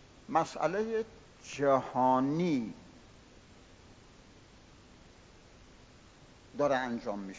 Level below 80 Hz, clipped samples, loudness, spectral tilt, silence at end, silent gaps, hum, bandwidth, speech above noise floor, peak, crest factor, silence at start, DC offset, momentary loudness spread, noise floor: -64 dBFS; under 0.1%; -31 LUFS; -6 dB/octave; 0 s; none; none; 7.8 kHz; 26 dB; -14 dBFS; 20 dB; 0.3 s; under 0.1%; 17 LU; -57 dBFS